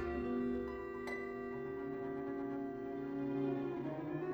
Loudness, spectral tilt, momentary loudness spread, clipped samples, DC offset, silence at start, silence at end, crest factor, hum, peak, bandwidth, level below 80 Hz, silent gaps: -41 LUFS; -8.5 dB/octave; 5 LU; under 0.1%; under 0.1%; 0 s; 0 s; 14 dB; none; -28 dBFS; over 20 kHz; -60 dBFS; none